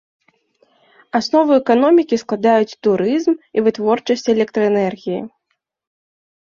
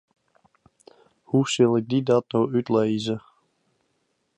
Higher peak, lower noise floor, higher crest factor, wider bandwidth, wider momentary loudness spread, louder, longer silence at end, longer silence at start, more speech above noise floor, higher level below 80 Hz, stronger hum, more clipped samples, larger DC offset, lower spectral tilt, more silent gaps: first, -2 dBFS vs -6 dBFS; about the same, -72 dBFS vs -72 dBFS; about the same, 16 dB vs 18 dB; second, 7.4 kHz vs 10.5 kHz; about the same, 9 LU vs 7 LU; first, -16 LUFS vs -23 LUFS; about the same, 1.2 s vs 1.2 s; second, 1.15 s vs 1.35 s; first, 56 dB vs 51 dB; first, -62 dBFS vs -68 dBFS; neither; neither; neither; about the same, -6 dB/octave vs -6 dB/octave; neither